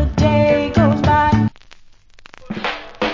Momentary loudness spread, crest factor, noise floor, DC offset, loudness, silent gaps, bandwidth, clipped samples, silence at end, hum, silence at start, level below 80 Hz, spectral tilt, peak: 11 LU; 16 dB; -43 dBFS; under 0.1%; -16 LUFS; none; 7.6 kHz; under 0.1%; 0 s; none; 0 s; -30 dBFS; -7.5 dB/octave; -2 dBFS